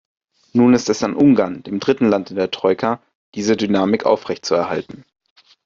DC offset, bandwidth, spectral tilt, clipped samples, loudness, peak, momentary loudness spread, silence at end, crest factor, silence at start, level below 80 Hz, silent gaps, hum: under 0.1%; 7.6 kHz; -5.5 dB/octave; under 0.1%; -18 LUFS; -2 dBFS; 10 LU; 0.65 s; 16 dB; 0.55 s; -58 dBFS; 3.15-3.32 s; none